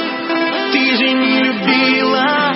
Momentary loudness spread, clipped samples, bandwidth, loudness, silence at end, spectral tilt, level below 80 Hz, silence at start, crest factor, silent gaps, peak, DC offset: 5 LU; under 0.1%; 5.8 kHz; -13 LUFS; 0 s; -7 dB/octave; -66 dBFS; 0 s; 14 dB; none; 0 dBFS; under 0.1%